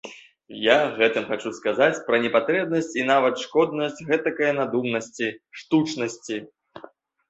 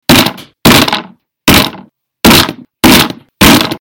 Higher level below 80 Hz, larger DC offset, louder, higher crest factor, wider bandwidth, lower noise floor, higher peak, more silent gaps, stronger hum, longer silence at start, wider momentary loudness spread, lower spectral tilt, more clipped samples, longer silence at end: second, -68 dBFS vs -28 dBFS; neither; second, -23 LUFS vs -7 LUFS; first, 22 dB vs 8 dB; second, 8.2 kHz vs over 20 kHz; first, -49 dBFS vs -35 dBFS; about the same, -2 dBFS vs 0 dBFS; neither; neither; about the same, 0.05 s vs 0.1 s; about the same, 9 LU vs 9 LU; about the same, -4.5 dB/octave vs -3.5 dB/octave; second, under 0.1% vs 4%; first, 0.5 s vs 0.05 s